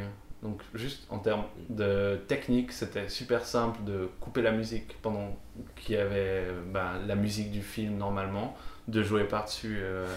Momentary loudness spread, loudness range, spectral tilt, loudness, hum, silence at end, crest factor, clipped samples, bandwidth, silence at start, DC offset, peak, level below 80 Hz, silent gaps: 11 LU; 2 LU; -6 dB/octave; -32 LUFS; none; 0 s; 18 dB; under 0.1%; 16 kHz; 0 s; under 0.1%; -14 dBFS; -48 dBFS; none